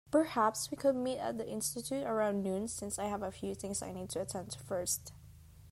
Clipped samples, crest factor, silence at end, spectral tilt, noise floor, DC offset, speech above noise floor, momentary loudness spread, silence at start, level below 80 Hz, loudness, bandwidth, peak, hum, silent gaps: under 0.1%; 18 dB; 0 s; -4 dB/octave; -56 dBFS; under 0.1%; 20 dB; 8 LU; 0.05 s; -64 dBFS; -36 LUFS; 16 kHz; -18 dBFS; none; none